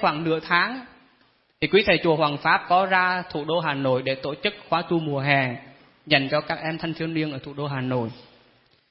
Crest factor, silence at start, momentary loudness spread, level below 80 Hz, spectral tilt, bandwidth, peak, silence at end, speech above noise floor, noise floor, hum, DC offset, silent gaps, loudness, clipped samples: 20 dB; 0 s; 9 LU; -58 dBFS; -10 dB/octave; 5.8 kHz; -4 dBFS; 0.7 s; 39 dB; -62 dBFS; none; under 0.1%; none; -23 LUFS; under 0.1%